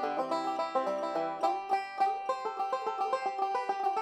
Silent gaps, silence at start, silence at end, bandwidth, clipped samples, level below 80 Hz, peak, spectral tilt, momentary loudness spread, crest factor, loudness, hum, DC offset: none; 0 s; 0 s; 11.5 kHz; under 0.1%; -80 dBFS; -16 dBFS; -3.5 dB/octave; 3 LU; 16 dB; -32 LUFS; none; under 0.1%